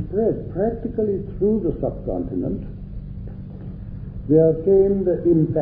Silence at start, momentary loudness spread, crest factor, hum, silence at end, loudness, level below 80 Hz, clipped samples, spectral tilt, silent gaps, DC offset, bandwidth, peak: 0 s; 18 LU; 16 dB; none; 0 s; -21 LUFS; -36 dBFS; under 0.1%; -14.5 dB/octave; none; under 0.1%; 2.6 kHz; -4 dBFS